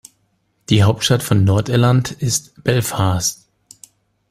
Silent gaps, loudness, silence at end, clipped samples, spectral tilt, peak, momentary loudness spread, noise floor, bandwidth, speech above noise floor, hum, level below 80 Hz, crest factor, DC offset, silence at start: none; -17 LUFS; 0.95 s; under 0.1%; -5 dB/octave; -2 dBFS; 5 LU; -64 dBFS; 15.5 kHz; 49 dB; none; -46 dBFS; 16 dB; under 0.1%; 0.7 s